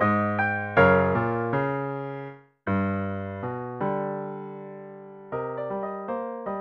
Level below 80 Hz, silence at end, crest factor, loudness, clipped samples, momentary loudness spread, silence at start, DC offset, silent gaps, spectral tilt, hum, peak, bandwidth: -58 dBFS; 0 s; 22 dB; -27 LUFS; under 0.1%; 18 LU; 0 s; under 0.1%; none; -9.5 dB/octave; none; -6 dBFS; 5.8 kHz